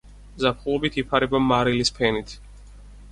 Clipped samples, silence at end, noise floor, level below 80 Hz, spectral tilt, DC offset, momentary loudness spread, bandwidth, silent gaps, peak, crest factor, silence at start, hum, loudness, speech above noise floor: under 0.1%; 0 s; -44 dBFS; -42 dBFS; -5 dB/octave; under 0.1%; 9 LU; 11.5 kHz; none; -6 dBFS; 18 dB; 0.05 s; 50 Hz at -40 dBFS; -22 LUFS; 21 dB